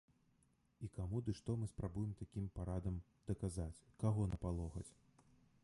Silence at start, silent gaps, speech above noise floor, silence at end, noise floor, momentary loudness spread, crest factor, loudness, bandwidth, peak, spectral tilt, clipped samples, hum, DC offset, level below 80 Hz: 0.8 s; none; 34 dB; 0.75 s; -77 dBFS; 10 LU; 20 dB; -45 LUFS; 11.5 kHz; -26 dBFS; -8 dB/octave; under 0.1%; none; under 0.1%; -54 dBFS